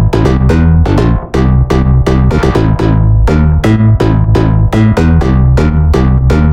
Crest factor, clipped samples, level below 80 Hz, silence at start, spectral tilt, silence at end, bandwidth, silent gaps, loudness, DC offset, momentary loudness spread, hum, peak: 8 dB; under 0.1%; -12 dBFS; 0 s; -8.5 dB/octave; 0 s; 10 kHz; none; -9 LUFS; 2%; 2 LU; none; 0 dBFS